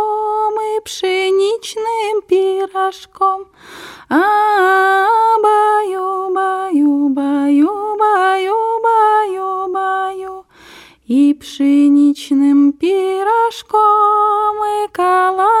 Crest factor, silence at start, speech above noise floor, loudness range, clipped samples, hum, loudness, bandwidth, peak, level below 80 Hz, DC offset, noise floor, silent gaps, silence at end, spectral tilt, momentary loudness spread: 12 dB; 0 s; 28 dB; 4 LU; under 0.1%; none; -14 LUFS; 14 kHz; -2 dBFS; -60 dBFS; under 0.1%; -41 dBFS; none; 0 s; -3.5 dB/octave; 8 LU